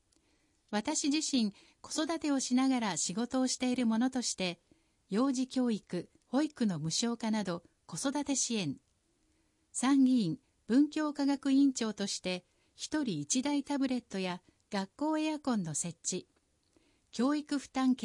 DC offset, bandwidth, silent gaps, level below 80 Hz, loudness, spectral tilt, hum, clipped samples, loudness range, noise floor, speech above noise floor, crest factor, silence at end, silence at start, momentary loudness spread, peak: under 0.1%; 11.5 kHz; none; -74 dBFS; -33 LUFS; -4 dB/octave; none; under 0.1%; 4 LU; -74 dBFS; 42 dB; 16 dB; 0 s; 0.7 s; 10 LU; -18 dBFS